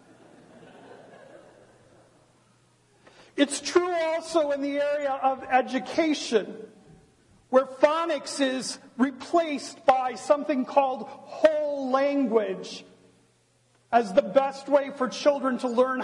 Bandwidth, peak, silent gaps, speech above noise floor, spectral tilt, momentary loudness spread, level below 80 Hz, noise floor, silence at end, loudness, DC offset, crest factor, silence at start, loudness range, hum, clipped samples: 11.5 kHz; -4 dBFS; none; 40 dB; -3.5 dB/octave; 8 LU; -72 dBFS; -65 dBFS; 0 s; -25 LUFS; under 0.1%; 22 dB; 0.65 s; 4 LU; none; under 0.1%